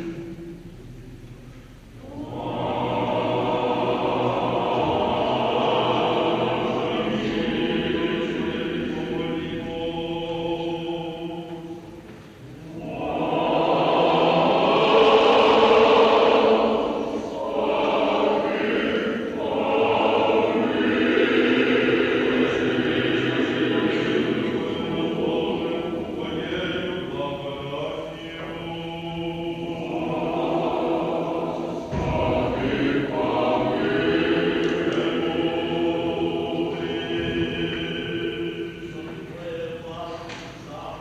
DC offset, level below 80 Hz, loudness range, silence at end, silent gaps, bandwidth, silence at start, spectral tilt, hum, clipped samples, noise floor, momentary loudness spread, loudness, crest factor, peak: under 0.1%; -48 dBFS; 11 LU; 0 s; none; 9.6 kHz; 0 s; -6.5 dB/octave; none; under 0.1%; -43 dBFS; 15 LU; -23 LUFS; 18 dB; -6 dBFS